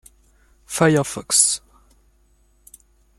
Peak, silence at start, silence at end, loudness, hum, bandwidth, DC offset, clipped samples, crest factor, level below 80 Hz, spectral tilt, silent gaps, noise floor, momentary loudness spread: 0 dBFS; 0.7 s; 1.6 s; -18 LUFS; none; 15 kHz; under 0.1%; under 0.1%; 24 dB; -54 dBFS; -3 dB/octave; none; -59 dBFS; 11 LU